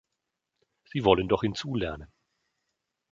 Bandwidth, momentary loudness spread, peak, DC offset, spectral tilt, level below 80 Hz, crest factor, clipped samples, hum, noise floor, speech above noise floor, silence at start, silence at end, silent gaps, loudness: 7.6 kHz; 12 LU; -4 dBFS; under 0.1%; -6.5 dB/octave; -52 dBFS; 26 dB; under 0.1%; none; -84 dBFS; 57 dB; 0.95 s; 1.05 s; none; -27 LUFS